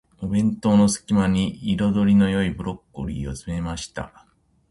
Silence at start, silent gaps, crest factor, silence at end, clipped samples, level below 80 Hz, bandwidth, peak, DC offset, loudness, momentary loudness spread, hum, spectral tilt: 0.2 s; none; 14 dB; 0.65 s; under 0.1%; -42 dBFS; 11.5 kHz; -8 dBFS; under 0.1%; -22 LUFS; 14 LU; none; -6 dB/octave